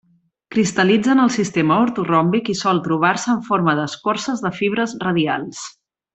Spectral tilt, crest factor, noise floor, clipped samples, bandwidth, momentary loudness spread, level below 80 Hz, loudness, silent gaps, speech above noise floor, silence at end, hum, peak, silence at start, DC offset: -5 dB/octave; 16 dB; -44 dBFS; under 0.1%; 8.4 kHz; 7 LU; -58 dBFS; -18 LUFS; none; 26 dB; 0.45 s; none; -2 dBFS; 0.5 s; under 0.1%